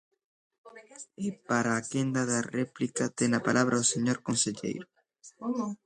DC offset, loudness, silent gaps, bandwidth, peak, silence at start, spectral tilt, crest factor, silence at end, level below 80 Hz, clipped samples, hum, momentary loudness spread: under 0.1%; -29 LUFS; none; 11 kHz; -12 dBFS; 0.65 s; -4 dB/octave; 20 dB; 0.1 s; -70 dBFS; under 0.1%; none; 12 LU